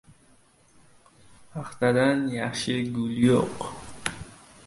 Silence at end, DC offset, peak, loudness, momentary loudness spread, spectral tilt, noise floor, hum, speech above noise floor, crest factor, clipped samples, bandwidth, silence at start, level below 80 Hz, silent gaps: 0.3 s; under 0.1%; -6 dBFS; -26 LUFS; 17 LU; -5.5 dB/octave; -59 dBFS; none; 35 dB; 22 dB; under 0.1%; 11.5 kHz; 1.4 s; -56 dBFS; none